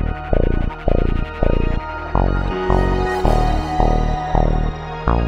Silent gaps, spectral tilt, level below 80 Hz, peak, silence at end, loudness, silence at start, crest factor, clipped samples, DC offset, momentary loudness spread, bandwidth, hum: none; -8 dB/octave; -20 dBFS; 0 dBFS; 0 s; -20 LUFS; 0 s; 16 dB; under 0.1%; under 0.1%; 5 LU; 8.4 kHz; none